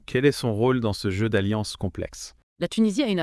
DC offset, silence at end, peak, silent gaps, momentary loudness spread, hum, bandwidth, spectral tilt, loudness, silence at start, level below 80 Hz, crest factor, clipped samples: under 0.1%; 0 s; -6 dBFS; 2.43-2.56 s; 12 LU; none; 12 kHz; -6 dB/octave; -25 LUFS; 0.1 s; -50 dBFS; 18 dB; under 0.1%